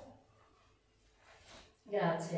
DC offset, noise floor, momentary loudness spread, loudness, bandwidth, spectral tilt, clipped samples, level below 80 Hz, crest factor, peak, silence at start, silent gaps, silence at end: under 0.1%; -70 dBFS; 24 LU; -36 LUFS; 8 kHz; -6 dB/octave; under 0.1%; -72 dBFS; 18 dB; -22 dBFS; 0 s; none; 0 s